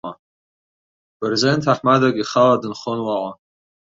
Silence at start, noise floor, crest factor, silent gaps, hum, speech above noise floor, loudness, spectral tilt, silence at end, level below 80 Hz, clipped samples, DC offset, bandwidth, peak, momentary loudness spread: 0.05 s; under -90 dBFS; 18 dB; 0.19-1.20 s; none; over 72 dB; -18 LUFS; -5.5 dB/octave; 0.6 s; -60 dBFS; under 0.1%; under 0.1%; 7.8 kHz; -2 dBFS; 11 LU